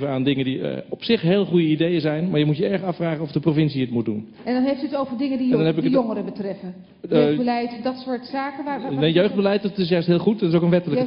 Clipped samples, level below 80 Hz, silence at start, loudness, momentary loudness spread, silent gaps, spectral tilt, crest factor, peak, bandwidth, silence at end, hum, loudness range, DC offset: under 0.1%; -60 dBFS; 0 s; -21 LUFS; 10 LU; none; -10.5 dB/octave; 16 dB; -6 dBFS; 5.6 kHz; 0 s; none; 2 LU; under 0.1%